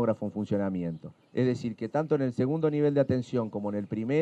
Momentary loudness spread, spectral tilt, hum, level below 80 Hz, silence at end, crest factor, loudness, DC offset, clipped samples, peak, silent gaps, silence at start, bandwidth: 8 LU; -9 dB/octave; none; -70 dBFS; 0 s; 16 dB; -29 LUFS; under 0.1%; under 0.1%; -12 dBFS; none; 0 s; 9.2 kHz